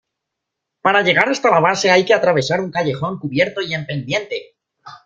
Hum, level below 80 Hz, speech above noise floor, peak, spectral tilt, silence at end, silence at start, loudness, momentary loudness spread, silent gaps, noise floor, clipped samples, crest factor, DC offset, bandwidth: none; -60 dBFS; 63 dB; 0 dBFS; -4.5 dB/octave; 0.1 s; 0.85 s; -16 LUFS; 10 LU; none; -80 dBFS; under 0.1%; 18 dB; under 0.1%; 9 kHz